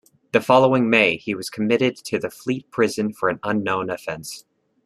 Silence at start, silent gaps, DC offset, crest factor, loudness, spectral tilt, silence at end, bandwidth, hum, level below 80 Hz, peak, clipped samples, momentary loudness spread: 0.35 s; none; under 0.1%; 20 dB; -21 LUFS; -5 dB/octave; 0.45 s; 14 kHz; none; -62 dBFS; -2 dBFS; under 0.1%; 13 LU